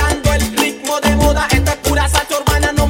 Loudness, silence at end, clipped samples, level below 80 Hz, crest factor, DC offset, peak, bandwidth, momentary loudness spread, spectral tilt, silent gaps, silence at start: -15 LUFS; 0 s; under 0.1%; -20 dBFS; 14 dB; under 0.1%; 0 dBFS; 16.5 kHz; 3 LU; -4 dB/octave; none; 0 s